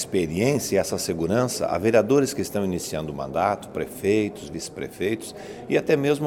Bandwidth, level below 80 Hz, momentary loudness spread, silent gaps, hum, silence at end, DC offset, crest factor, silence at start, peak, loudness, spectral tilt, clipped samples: 18.5 kHz; -52 dBFS; 11 LU; none; none; 0 s; under 0.1%; 18 dB; 0 s; -6 dBFS; -24 LUFS; -5 dB/octave; under 0.1%